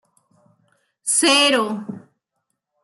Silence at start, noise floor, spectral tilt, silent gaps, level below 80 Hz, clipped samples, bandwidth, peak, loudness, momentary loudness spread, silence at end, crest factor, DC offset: 1.05 s; -77 dBFS; -1 dB/octave; none; -76 dBFS; under 0.1%; 12.5 kHz; -4 dBFS; -16 LUFS; 21 LU; 0.85 s; 18 dB; under 0.1%